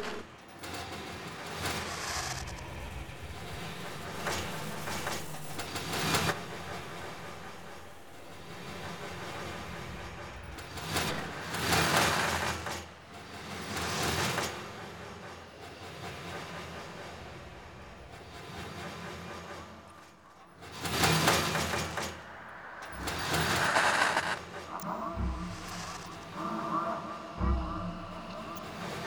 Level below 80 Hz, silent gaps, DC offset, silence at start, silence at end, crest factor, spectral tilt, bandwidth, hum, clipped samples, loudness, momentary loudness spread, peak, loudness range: -48 dBFS; none; under 0.1%; 0 s; 0 s; 26 dB; -3 dB/octave; over 20 kHz; none; under 0.1%; -34 LUFS; 19 LU; -10 dBFS; 13 LU